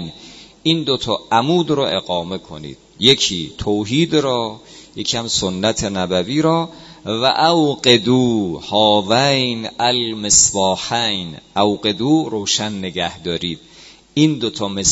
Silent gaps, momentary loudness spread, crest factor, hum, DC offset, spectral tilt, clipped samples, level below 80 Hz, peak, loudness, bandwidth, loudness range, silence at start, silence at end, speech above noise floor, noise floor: none; 12 LU; 18 dB; none; under 0.1%; -3.5 dB/octave; under 0.1%; -46 dBFS; 0 dBFS; -17 LUFS; 8.4 kHz; 4 LU; 0 s; 0 s; 23 dB; -41 dBFS